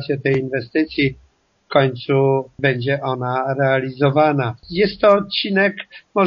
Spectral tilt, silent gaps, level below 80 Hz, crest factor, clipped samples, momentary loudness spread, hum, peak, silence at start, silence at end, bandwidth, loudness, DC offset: -4.5 dB/octave; none; -52 dBFS; 18 dB; under 0.1%; 6 LU; none; 0 dBFS; 0 s; 0 s; 5.8 kHz; -18 LUFS; under 0.1%